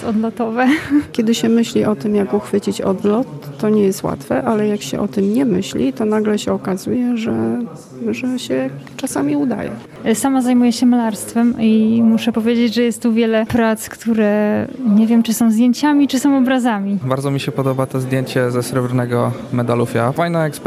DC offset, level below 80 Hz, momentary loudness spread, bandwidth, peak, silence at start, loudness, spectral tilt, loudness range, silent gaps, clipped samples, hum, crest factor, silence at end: under 0.1%; -52 dBFS; 7 LU; 15 kHz; -2 dBFS; 0 s; -17 LUFS; -6 dB/octave; 4 LU; none; under 0.1%; none; 14 dB; 0 s